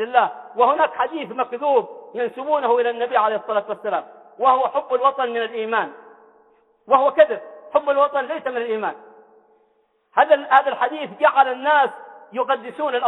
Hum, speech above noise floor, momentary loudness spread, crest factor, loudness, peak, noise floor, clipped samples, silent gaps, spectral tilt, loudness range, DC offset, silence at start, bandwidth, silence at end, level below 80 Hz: none; 44 dB; 10 LU; 18 dB; -20 LUFS; -2 dBFS; -64 dBFS; under 0.1%; none; -5.5 dB/octave; 3 LU; under 0.1%; 0 s; 4.1 kHz; 0 s; -76 dBFS